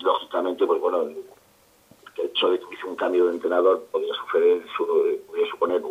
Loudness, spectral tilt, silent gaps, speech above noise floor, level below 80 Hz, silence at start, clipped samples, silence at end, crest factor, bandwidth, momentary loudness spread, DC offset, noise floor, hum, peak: -23 LUFS; -4 dB/octave; none; 35 dB; -74 dBFS; 0 s; under 0.1%; 0 s; 16 dB; 13.5 kHz; 8 LU; under 0.1%; -58 dBFS; none; -8 dBFS